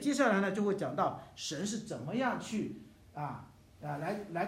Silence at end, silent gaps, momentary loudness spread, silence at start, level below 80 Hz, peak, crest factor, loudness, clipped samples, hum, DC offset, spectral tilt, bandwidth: 0 s; none; 14 LU; 0 s; -68 dBFS; -14 dBFS; 20 dB; -35 LUFS; under 0.1%; none; under 0.1%; -5 dB/octave; 14.5 kHz